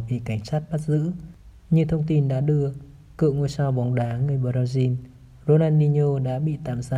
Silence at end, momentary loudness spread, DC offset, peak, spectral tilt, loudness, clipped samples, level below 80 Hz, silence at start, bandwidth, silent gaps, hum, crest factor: 0 s; 10 LU; under 0.1%; -6 dBFS; -9 dB/octave; -23 LUFS; under 0.1%; -48 dBFS; 0 s; 9.8 kHz; none; none; 16 dB